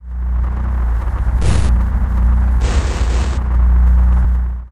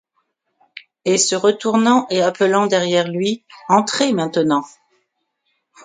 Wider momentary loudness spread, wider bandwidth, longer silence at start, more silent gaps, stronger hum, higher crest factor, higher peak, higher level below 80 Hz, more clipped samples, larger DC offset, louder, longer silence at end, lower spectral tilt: about the same, 7 LU vs 7 LU; about the same, 10 kHz vs 9.6 kHz; second, 0 s vs 0.75 s; neither; neither; second, 12 dB vs 18 dB; about the same, -2 dBFS vs 0 dBFS; first, -14 dBFS vs -66 dBFS; neither; neither; about the same, -16 LUFS vs -17 LUFS; second, 0 s vs 1.15 s; first, -6.5 dB/octave vs -4 dB/octave